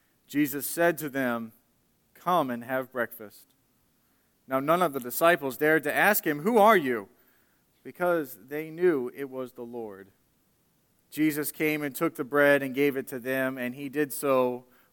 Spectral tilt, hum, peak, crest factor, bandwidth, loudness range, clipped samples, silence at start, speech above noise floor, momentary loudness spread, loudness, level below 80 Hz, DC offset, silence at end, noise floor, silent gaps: -4.5 dB/octave; none; -8 dBFS; 20 dB; 17.5 kHz; 8 LU; under 0.1%; 0.3 s; 42 dB; 15 LU; -27 LUFS; -76 dBFS; under 0.1%; 0.3 s; -69 dBFS; none